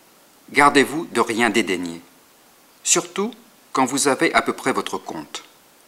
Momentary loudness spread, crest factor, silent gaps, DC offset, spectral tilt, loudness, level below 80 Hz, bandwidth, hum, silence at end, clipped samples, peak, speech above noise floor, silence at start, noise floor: 17 LU; 22 dB; none; under 0.1%; -2.5 dB/octave; -20 LUFS; -60 dBFS; 16 kHz; none; 0.45 s; under 0.1%; 0 dBFS; 33 dB; 0.5 s; -53 dBFS